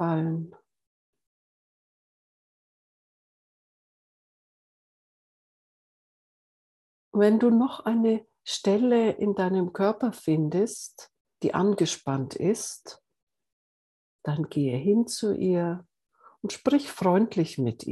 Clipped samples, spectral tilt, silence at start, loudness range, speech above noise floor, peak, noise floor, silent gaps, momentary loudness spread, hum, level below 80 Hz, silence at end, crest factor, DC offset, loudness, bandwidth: under 0.1%; -6 dB/octave; 0 s; 6 LU; over 65 dB; -8 dBFS; under -90 dBFS; 0.87-1.13 s, 1.27-7.12 s, 11.21-11.25 s, 13.23-13.27 s, 13.53-14.19 s; 12 LU; none; -72 dBFS; 0 s; 20 dB; under 0.1%; -26 LUFS; 12.5 kHz